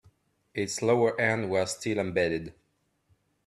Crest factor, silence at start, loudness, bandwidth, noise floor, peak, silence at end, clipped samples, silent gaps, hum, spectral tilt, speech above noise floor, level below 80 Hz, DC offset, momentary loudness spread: 20 dB; 0.55 s; -28 LUFS; 13 kHz; -73 dBFS; -10 dBFS; 0.95 s; under 0.1%; none; none; -4.5 dB/octave; 46 dB; -64 dBFS; under 0.1%; 11 LU